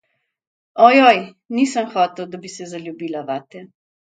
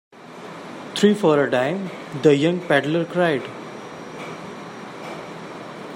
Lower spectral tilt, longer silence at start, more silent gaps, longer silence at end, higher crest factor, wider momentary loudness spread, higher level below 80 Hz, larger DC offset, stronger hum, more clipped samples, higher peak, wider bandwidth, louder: second, -4 dB/octave vs -6 dB/octave; first, 0.75 s vs 0.15 s; neither; first, 0.45 s vs 0 s; about the same, 18 dB vs 20 dB; about the same, 20 LU vs 18 LU; about the same, -72 dBFS vs -68 dBFS; neither; neither; neither; about the same, 0 dBFS vs -2 dBFS; second, 9.2 kHz vs 16 kHz; first, -16 LUFS vs -20 LUFS